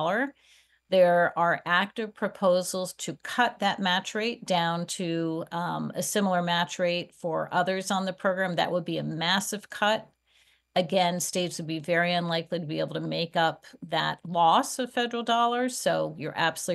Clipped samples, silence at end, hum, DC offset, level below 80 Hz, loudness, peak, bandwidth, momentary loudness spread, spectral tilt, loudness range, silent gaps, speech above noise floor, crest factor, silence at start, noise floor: under 0.1%; 0 s; none; under 0.1%; -74 dBFS; -27 LUFS; -8 dBFS; 12.5 kHz; 8 LU; -4 dB/octave; 2 LU; none; 38 dB; 18 dB; 0 s; -65 dBFS